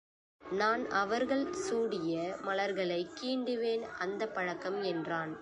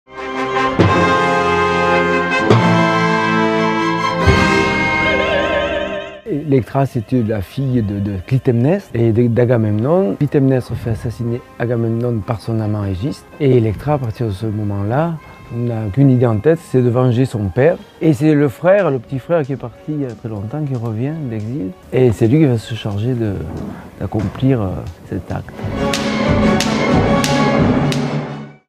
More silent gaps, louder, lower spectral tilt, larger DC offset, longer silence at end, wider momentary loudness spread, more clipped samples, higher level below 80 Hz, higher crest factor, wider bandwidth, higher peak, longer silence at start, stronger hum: neither; second, -34 LUFS vs -16 LUFS; second, -4.5 dB/octave vs -6.5 dB/octave; neither; second, 0 s vs 0.15 s; second, 5 LU vs 11 LU; neither; second, -72 dBFS vs -36 dBFS; about the same, 18 dB vs 16 dB; second, 11 kHz vs 14.5 kHz; second, -16 dBFS vs 0 dBFS; first, 0.4 s vs 0.1 s; neither